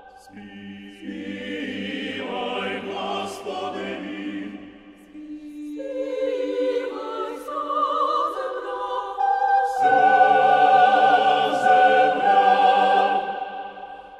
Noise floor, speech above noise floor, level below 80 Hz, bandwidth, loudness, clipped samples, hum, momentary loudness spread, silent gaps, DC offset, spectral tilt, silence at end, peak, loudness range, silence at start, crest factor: -45 dBFS; 9 dB; -64 dBFS; 11 kHz; -21 LUFS; under 0.1%; none; 20 LU; none; under 0.1%; -4.5 dB/octave; 0 s; -4 dBFS; 14 LU; 0.05 s; 18 dB